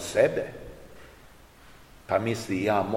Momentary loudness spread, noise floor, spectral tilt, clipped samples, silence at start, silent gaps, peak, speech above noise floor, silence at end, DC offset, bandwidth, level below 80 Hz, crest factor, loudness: 25 LU; -52 dBFS; -5.5 dB/octave; under 0.1%; 0 s; none; -8 dBFS; 27 dB; 0 s; 0.1%; 16.5 kHz; -54 dBFS; 20 dB; -27 LUFS